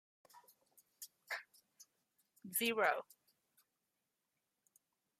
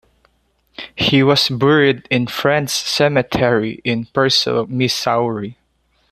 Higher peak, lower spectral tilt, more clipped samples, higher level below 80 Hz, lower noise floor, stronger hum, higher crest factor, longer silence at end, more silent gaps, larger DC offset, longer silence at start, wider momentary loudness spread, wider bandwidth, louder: second, -20 dBFS vs -2 dBFS; second, -1.5 dB/octave vs -4.5 dB/octave; neither; second, under -90 dBFS vs -50 dBFS; first, -88 dBFS vs -62 dBFS; neither; first, 26 dB vs 16 dB; first, 2.2 s vs 0.6 s; neither; neither; second, 0.35 s vs 0.8 s; first, 23 LU vs 9 LU; about the same, 15.5 kHz vs 14.5 kHz; second, -39 LUFS vs -16 LUFS